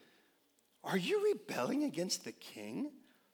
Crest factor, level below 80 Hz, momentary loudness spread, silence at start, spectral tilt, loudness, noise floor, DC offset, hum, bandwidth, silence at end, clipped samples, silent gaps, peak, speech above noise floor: 16 dB; under -90 dBFS; 14 LU; 0.85 s; -4 dB/octave; -37 LUFS; -74 dBFS; under 0.1%; none; over 20 kHz; 0.35 s; under 0.1%; none; -22 dBFS; 37 dB